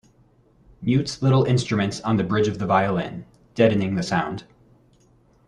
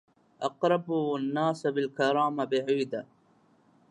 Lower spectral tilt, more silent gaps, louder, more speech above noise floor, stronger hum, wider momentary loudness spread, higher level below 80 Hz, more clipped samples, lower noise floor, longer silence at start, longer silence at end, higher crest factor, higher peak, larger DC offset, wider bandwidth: about the same, -6.5 dB/octave vs -6 dB/octave; neither; first, -22 LUFS vs -29 LUFS; about the same, 37 dB vs 36 dB; neither; first, 12 LU vs 9 LU; first, -54 dBFS vs -82 dBFS; neither; second, -58 dBFS vs -64 dBFS; first, 0.8 s vs 0.4 s; first, 1.05 s vs 0.85 s; about the same, 18 dB vs 18 dB; first, -4 dBFS vs -12 dBFS; neither; about the same, 10.5 kHz vs 11 kHz